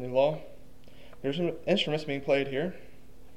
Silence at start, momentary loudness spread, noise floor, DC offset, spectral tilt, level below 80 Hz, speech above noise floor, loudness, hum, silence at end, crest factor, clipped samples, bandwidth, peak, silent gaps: 0 s; 10 LU; -53 dBFS; 0.7%; -6 dB/octave; -58 dBFS; 24 dB; -30 LUFS; none; 0.25 s; 18 dB; under 0.1%; 11.5 kHz; -12 dBFS; none